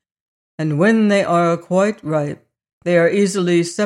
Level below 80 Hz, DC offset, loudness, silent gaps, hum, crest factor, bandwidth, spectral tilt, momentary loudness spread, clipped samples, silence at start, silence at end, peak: -64 dBFS; under 0.1%; -17 LUFS; 2.73-2.81 s; none; 14 dB; 12 kHz; -6 dB/octave; 11 LU; under 0.1%; 0.6 s; 0 s; -4 dBFS